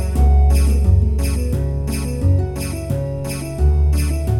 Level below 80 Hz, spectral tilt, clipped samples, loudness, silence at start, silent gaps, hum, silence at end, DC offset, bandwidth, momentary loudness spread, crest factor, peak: -18 dBFS; -7 dB/octave; under 0.1%; -18 LUFS; 0 s; none; none; 0 s; under 0.1%; 15.5 kHz; 9 LU; 12 dB; -4 dBFS